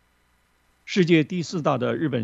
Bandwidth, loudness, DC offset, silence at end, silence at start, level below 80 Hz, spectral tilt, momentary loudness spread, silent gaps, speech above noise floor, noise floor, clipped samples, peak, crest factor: 8 kHz; -23 LUFS; under 0.1%; 0 s; 0.85 s; -66 dBFS; -6.5 dB/octave; 7 LU; none; 43 dB; -65 dBFS; under 0.1%; -6 dBFS; 18 dB